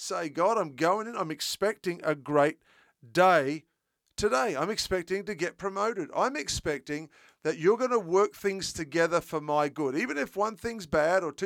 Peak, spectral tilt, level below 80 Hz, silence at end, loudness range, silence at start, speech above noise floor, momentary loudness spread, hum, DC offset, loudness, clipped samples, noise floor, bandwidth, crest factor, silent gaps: -10 dBFS; -4 dB/octave; -58 dBFS; 0 s; 3 LU; 0 s; 49 dB; 8 LU; none; under 0.1%; -29 LUFS; under 0.1%; -78 dBFS; 17.5 kHz; 20 dB; none